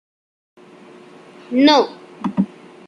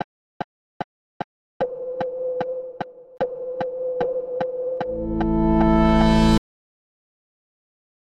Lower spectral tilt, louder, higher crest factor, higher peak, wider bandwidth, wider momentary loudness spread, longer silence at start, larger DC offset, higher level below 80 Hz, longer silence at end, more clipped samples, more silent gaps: second, -5.5 dB/octave vs -7.5 dB/octave; first, -17 LUFS vs -22 LUFS; about the same, 18 dB vs 18 dB; about the same, -2 dBFS vs -4 dBFS; about the same, 10 kHz vs 10.5 kHz; second, 12 LU vs 20 LU; first, 1.5 s vs 0 s; neither; second, -64 dBFS vs -32 dBFS; second, 0.4 s vs 1.6 s; neither; second, none vs 0.04-1.60 s